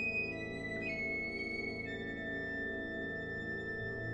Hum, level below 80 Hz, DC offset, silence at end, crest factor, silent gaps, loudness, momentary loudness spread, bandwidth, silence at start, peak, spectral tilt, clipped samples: none; -58 dBFS; under 0.1%; 0 s; 14 dB; none; -39 LUFS; 4 LU; 10.5 kHz; 0 s; -26 dBFS; -6.5 dB/octave; under 0.1%